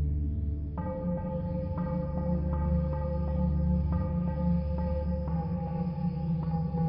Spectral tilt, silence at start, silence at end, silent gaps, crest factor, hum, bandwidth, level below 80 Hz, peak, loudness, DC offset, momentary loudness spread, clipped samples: -11 dB/octave; 0 s; 0 s; none; 12 dB; none; 5.2 kHz; -34 dBFS; -18 dBFS; -31 LUFS; under 0.1%; 4 LU; under 0.1%